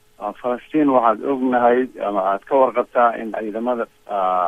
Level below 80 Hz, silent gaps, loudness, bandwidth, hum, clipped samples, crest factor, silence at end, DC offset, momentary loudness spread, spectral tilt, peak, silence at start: -60 dBFS; none; -19 LUFS; 9.8 kHz; none; under 0.1%; 18 dB; 0 s; under 0.1%; 10 LU; -7.5 dB/octave; -2 dBFS; 0.2 s